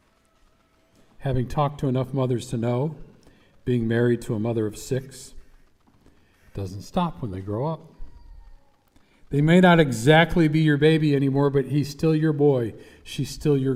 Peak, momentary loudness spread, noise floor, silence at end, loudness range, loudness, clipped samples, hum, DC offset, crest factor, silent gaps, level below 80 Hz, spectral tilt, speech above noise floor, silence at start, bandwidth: -4 dBFS; 16 LU; -61 dBFS; 0 s; 13 LU; -22 LUFS; under 0.1%; none; under 0.1%; 20 dB; none; -46 dBFS; -7 dB/octave; 40 dB; 1.2 s; 15 kHz